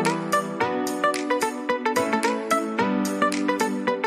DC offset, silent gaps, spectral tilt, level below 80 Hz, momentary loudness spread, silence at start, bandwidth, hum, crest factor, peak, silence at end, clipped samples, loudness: under 0.1%; none; -4 dB/octave; -68 dBFS; 2 LU; 0 s; 15 kHz; none; 16 dB; -6 dBFS; 0 s; under 0.1%; -24 LUFS